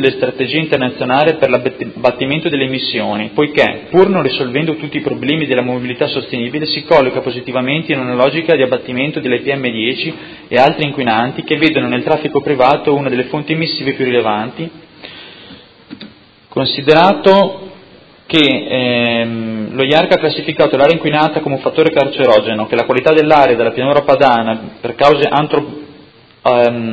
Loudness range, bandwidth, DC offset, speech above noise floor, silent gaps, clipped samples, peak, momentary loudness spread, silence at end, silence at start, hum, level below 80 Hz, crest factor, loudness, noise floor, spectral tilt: 4 LU; 8 kHz; under 0.1%; 29 dB; none; 0.2%; 0 dBFS; 9 LU; 0 s; 0 s; none; -50 dBFS; 14 dB; -13 LUFS; -42 dBFS; -7 dB/octave